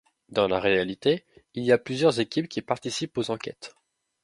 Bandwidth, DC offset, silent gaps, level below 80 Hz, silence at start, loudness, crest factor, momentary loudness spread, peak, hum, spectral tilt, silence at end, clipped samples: 11.5 kHz; under 0.1%; none; -60 dBFS; 0.3 s; -26 LUFS; 20 dB; 12 LU; -6 dBFS; none; -5 dB/octave; 0.55 s; under 0.1%